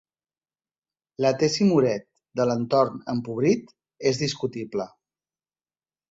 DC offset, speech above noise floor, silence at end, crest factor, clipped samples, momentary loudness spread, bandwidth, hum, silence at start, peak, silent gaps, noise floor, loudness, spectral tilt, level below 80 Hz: under 0.1%; over 67 dB; 1.25 s; 18 dB; under 0.1%; 12 LU; 8 kHz; none; 1.2 s; -8 dBFS; none; under -90 dBFS; -24 LUFS; -5.5 dB/octave; -64 dBFS